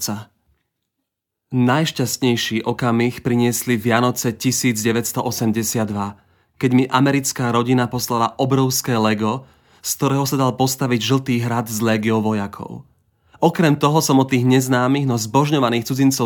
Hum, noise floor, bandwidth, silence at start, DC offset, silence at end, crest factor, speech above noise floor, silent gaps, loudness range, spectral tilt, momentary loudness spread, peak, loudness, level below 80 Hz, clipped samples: none; -79 dBFS; 19.5 kHz; 0 s; under 0.1%; 0 s; 18 dB; 61 dB; none; 2 LU; -5 dB/octave; 8 LU; 0 dBFS; -18 LUFS; -58 dBFS; under 0.1%